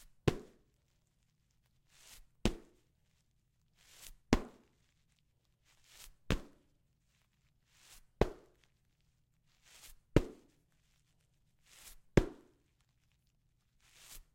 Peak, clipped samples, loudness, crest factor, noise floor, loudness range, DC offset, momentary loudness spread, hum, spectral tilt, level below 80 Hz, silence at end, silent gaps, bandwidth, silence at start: -8 dBFS; under 0.1%; -37 LUFS; 36 dB; -76 dBFS; 8 LU; under 0.1%; 25 LU; none; -6 dB/octave; -50 dBFS; 0.15 s; none; 16.5 kHz; 0.25 s